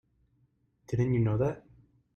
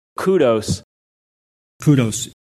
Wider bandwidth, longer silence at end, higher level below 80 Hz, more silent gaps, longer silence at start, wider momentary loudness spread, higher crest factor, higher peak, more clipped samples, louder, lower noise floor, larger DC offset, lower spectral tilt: second, 7 kHz vs 13.5 kHz; first, 0.55 s vs 0.2 s; second, -56 dBFS vs -50 dBFS; second, none vs 0.84-1.80 s; first, 0.9 s vs 0.2 s; about the same, 9 LU vs 10 LU; about the same, 16 dB vs 18 dB; second, -16 dBFS vs -2 dBFS; neither; second, -30 LUFS vs -18 LUFS; second, -71 dBFS vs under -90 dBFS; neither; first, -9.5 dB/octave vs -6 dB/octave